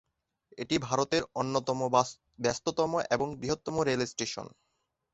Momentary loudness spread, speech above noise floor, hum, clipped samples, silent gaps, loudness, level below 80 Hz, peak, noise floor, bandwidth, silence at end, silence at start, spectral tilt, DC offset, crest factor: 8 LU; 49 dB; none; under 0.1%; none; -31 LUFS; -62 dBFS; -10 dBFS; -80 dBFS; 8.2 kHz; 0.65 s; 0.55 s; -4 dB/octave; under 0.1%; 22 dB